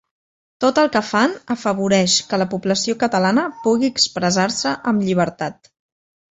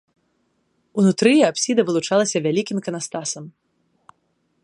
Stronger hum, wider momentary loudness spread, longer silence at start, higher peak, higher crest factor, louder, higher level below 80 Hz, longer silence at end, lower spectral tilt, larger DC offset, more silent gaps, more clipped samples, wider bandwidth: neither; second, 5 LU vs 12 LU; second, 0.6 s vs 0.95 s; about the same, -2 dBFS vs -2 dBFS; about the same, 18 dB vs 20 dB; about the same, -18 LUFS vs -19 LUFS; first, -58 dBFS vs -68 dBFS; second, 0.85 s vs 1.15 s; about the same, -4 dB/octave vs -4.5 dB/octave; neither; neither; neither; second, 8.2 kHz vs 11.5 kHz